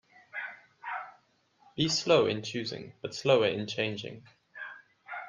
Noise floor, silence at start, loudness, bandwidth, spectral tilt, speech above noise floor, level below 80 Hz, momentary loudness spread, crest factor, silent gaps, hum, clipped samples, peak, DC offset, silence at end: -67 dBFS; 0.35 s; -30 LUFS; 9.8 kHz; -4 dB/octave; 38 dB; -70 dBFS; 20 LU; 22 dB; none; none; under 0.1%; -10 dBFS; under 0.1%; 0 s